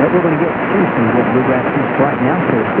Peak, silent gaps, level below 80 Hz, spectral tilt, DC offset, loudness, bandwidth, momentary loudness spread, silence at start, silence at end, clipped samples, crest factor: 0 dBFS; none; -46 dBFS; -11 dB/octave; under 0.1%; -14 LUFS; 4 kHz; 2 LU; 0 s; 0 s; under 0.1%; 14 dB